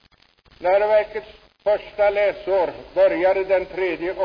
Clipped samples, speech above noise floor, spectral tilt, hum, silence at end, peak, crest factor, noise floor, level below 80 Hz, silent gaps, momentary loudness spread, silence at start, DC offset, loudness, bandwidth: under 0.1%; 37 dB; -6.5 dB/octave; none; 0 s; -8 dBFS; 14 dB; -57 dBFS; -52 dBFS; none; 8 LU; 0.6 s; under 0.1%; -21 LUFS; 5.4 kHz